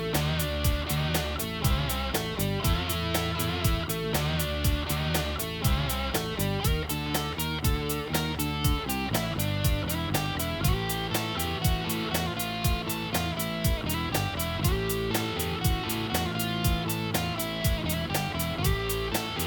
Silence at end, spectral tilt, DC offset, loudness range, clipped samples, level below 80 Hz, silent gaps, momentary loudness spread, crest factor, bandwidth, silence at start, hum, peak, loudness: 0 s; -4.5 dB/octave; under 0.1%; 1 LU; under 0.1%; -36 dBFS; none; 2 LU; 18 dB; over 20 kHz; 0 s; none; -10 dBFS; -28 LUFS